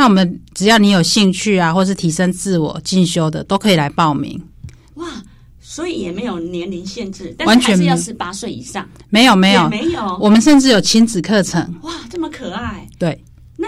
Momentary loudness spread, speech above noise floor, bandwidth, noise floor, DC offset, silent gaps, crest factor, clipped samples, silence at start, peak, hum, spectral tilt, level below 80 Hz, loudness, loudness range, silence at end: 17 LU; 22 dB; 15 kHz; -36 dBFS; under 0.1%; none; 12 dB; under 0.1%; 0 s; -2 dBFS; none; -4.5 dB/octave; -44 dBFS; -14 LUFS; 8 LU; 0 s